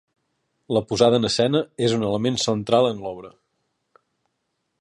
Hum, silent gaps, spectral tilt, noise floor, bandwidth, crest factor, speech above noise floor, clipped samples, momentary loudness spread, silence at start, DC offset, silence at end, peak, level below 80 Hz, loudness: none; none; -5 dB/octave; -76 dBFS; 11.5 kHz; 20 dB; 55 dB; under 0.1%; 9 LU; 0.7 s; under 0.1%; 1.5 s; -4 dBFS; -56 dBFS; -21 LUFS